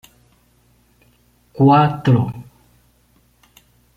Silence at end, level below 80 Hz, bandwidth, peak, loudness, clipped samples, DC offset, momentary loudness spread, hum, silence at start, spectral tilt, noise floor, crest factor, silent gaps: 1.55 s; -54 dBFS; 7.2 kHz; -2 dBFS; -15 LUFS; under 0.1%; under 0.1%; 14 LU; 60 Hz at -45 dBFS; 1.55 s; -9 dB/octave; -57 dBFS; 18 dB; none